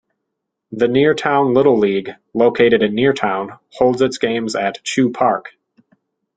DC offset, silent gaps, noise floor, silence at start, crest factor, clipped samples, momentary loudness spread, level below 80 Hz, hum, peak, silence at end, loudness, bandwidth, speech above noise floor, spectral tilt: under 0.1%; none; -77 dBFS; 0.7 s; 16 dB; under 0.1%; 10 LU; -56 dBFS; none; -2 dBFS; 0.9 s; -16 LUFS; 9.2 kHz; 61 dB; -5.5 dB/octave